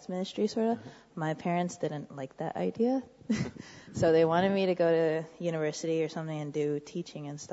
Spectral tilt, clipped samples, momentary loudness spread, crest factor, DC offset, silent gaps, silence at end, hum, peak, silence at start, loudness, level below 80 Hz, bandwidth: -6 dB/octave; under 0.1%; 13 LU; 18 dB; under 0.1%; none; 0 s; none; -14 dBFS; 0 s; -31 LUFS; -64 dBFS; 8 kHz